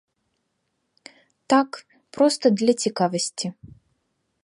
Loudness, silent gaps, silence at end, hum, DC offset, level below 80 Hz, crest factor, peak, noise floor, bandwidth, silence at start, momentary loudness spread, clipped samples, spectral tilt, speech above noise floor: -22 LUFS; none; 0.9 s; none; under 0.1%; -68 dBFS; 20 dB; -4 dBFS; -75 dBFS; 11.5 kHz; 1.5 s; 13 LU; under 0.1%; -4.5 dB/octave; 54 dB